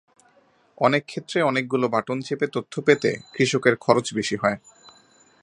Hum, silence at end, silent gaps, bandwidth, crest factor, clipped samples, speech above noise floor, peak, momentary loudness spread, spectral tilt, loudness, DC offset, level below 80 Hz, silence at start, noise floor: none; 0.85 s; none; 11 kHz; 22 dB; under 0.1%; 38 dB; -2 dBFS; 6 LU; -5 dB/octave; -23 LUFS; under 0.1%; -64 dBFS; 0.8 s; -60 dBFS